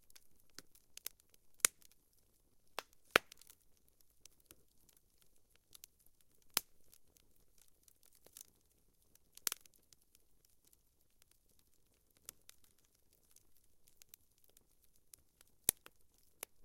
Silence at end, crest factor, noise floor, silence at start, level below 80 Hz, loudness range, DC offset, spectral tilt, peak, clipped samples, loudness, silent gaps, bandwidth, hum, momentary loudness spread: 0.95 s; 46 dB; -73 dBFS; 1.65 s; -76 dBFS; 24 LU; under 0.1%; 0 dB/octave; -4 dBFS; under 0.1%; -39 LUFS; none; 16.5 kHz; none; 28 LU